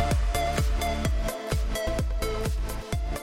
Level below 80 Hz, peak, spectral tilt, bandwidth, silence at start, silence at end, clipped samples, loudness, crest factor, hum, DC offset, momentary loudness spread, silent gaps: -28 dBFS; -14 dBFS; -5 dB/octave; 17 kHz; 0 s; 0 s; under 0.1%; -29 LUFS; 12 dB; none; under 0.1%; 5 LU; none